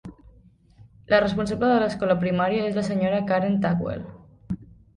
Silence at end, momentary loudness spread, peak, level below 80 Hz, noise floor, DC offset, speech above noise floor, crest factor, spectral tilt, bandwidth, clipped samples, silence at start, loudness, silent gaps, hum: 0.3 s; 14 LU; -6 dBFS; -50 dBFS; -54 dBFS; under 0.1%; 32 dB; 18 dB; -7 dB/octave; 11 kHz; under 0.1%; 0.05 s; -23 LUFS; none; none